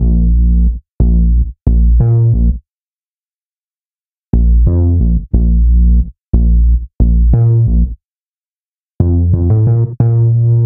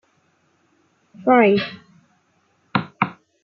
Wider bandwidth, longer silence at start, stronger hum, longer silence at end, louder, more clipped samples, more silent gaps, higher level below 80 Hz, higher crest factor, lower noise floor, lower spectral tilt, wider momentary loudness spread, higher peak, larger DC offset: second, 1.4 kHz vs 6 kHz; second, 0 s vs 1.2 s; neither; second, 0 s vs 0.3 s; first, -12 LUFS vs -20 LUFS; neither; first, 0.92-0.99 s, 2.71-3.77 s, 3.85-3.92 s, 4.05-4.31 s, 6.28-6.33 s, 8.05-8.89 s, 8.95-8.99 s vs none; first, -12 dBFS vs -68 dBFS; second, 10 dB vs 22 dB; first, under -90 dBFS vs -63 dBFS; first, -16 dB/octave vs -8.5 dB/octave; second, 5 LU vs 11 LU; about the same, 0 dBFS vs -2 dBFS; neither